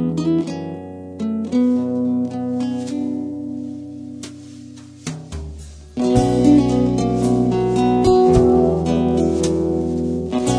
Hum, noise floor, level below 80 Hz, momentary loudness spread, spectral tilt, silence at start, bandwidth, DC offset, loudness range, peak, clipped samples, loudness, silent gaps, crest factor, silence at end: none; -38 dBFS; -36 dBFS; 19 LU; -7.5 dB/octave; 0 s; 10.5 kHz; under 0.1%; 12 LU; -2 dBFS; under 0.1%; -18 LUFS; none; 16 dB; 0 s